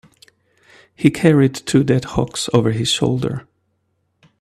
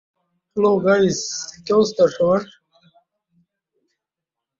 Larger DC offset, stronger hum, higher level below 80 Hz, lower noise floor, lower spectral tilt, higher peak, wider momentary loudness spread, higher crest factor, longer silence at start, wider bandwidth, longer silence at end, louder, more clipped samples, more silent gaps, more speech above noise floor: neither; neither; first, -46 dBFS vs -60 dBFS; second, -68 dBFS vs -85 dBFS; about the same, -5.5 dB/octave vs -5 dB/octave; first, 0 dBFS vs -4 dBFS; second, 8 LU vs 12 LU; about the same, 18 dB vs 18 dB; first, 1 s vs 0.55 s; first, 13.5 kHz vs 7.8 kHz; second, 1 s vs 2.15 s; about the same, -17 LUFS vs -19 LUFS; neither; neither; second, 51 dB vs 68 dB